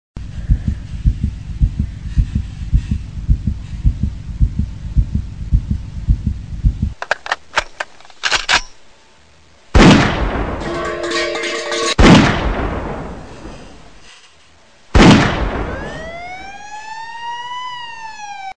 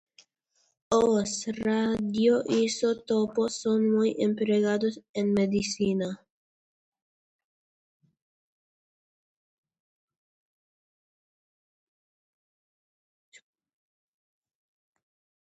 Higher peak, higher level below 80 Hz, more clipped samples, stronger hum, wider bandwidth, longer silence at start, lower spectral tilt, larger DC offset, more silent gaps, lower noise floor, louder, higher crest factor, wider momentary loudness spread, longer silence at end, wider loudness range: first, 0 dBFS vs -10 dBFS; first, -22 dBFS vs -66 dBFS; neither; neither; first, 10 kHz vs 8.8 kHz; second, 0.15 s vs 0.9 s; about the same, -5.5 dB/octave vs -5 dB/octave; first, 1% vs under 0.1%; second, none vs 5.09-5.14 s; second, -49 dBFS vs -73 dBFS; first, -17 LUFS vs -26 LUFS; about the same, 16 dB vs 20 dB; first, 20 LU vs 7 LU; second, 0 s vs 9.3 s; about the same, 7 LU vs 8 LU